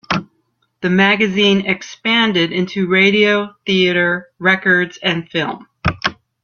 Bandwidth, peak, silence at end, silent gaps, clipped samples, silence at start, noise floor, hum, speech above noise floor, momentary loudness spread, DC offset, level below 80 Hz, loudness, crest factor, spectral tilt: 7 kHz; 0 dBFS; 0.3 s; none; under 0.1%; 0.1 s; -65 dBFS; none; 49 dB; 10 LU; under 0.1%; -48 dBFS; -15 LUFS; 16 dB; -5.5 dB/octave